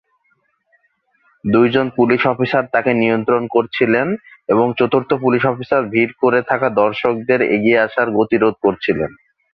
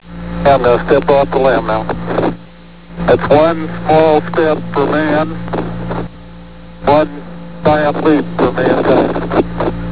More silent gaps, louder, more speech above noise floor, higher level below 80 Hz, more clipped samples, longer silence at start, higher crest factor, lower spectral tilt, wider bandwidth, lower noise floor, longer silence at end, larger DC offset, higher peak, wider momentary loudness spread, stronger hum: neither; second, -16 LUFS vs -13 LUFS; first, 48 dB vs 25 dB; second, -54 dBFS vs -34 dBFS; second, under 0.1% vs 0.2%; first, 1.45 s vs 0 s; about the same, 16 dB vs 14 dB; second, -9 dB/octave vs -11 dB/octave; first, 5.6 kHz vs 4 kHz; first, -63 dBFS vs -37 dBFS; first, 0.4 s vs 0 s; second, under 0.1% vs 4%; about the same, 0 dBFS vs 0 dBFS; second, 4 LU vs 11 LU; neither